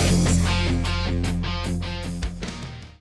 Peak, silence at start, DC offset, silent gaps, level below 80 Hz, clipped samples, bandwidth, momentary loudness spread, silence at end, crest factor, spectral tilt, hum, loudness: -8 dBFS; 0 s; under 0.1%; none; -30 dBFS; under 0.1%; 12 kHz; 13 LU; 0.1 s; 16 dB; -5 dB/octave; none; -24 LUFS